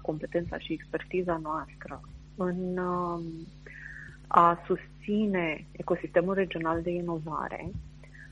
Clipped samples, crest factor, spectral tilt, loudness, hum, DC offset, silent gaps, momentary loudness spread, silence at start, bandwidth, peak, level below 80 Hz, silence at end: under 0.1%; 26 dB; -8 dB/octave; -30 LUFS; 50 Hz at -50 dBFS; under 0.1%; none; 18 LU; 0 s; 9 kHz; -4 dBFS; -52 dBFS; 0 s